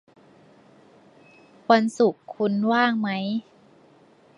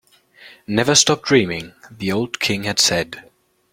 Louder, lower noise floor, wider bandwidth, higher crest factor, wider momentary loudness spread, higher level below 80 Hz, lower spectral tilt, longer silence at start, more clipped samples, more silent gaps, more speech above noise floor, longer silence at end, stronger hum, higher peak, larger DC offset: second, -23 LUFS vs -17 LUFS; first, -55 dBFS vs -47 dBFS; second, 11 kHz vs 16.5 kHz; about the same, 22 dB vs 20 dB; second, 9 LU vs 16 LU; second, -76 dBFS vs -54 dBFS; first, -6 dB/octave vs -3 dB/octave; first, 1.7 s vs 0.45 s; neither; neither; first, 33 dB vs 28 dB; first, 0.95 s vs 0.5 s; neither; second, -4 dBFS vs 0 dBFS; neither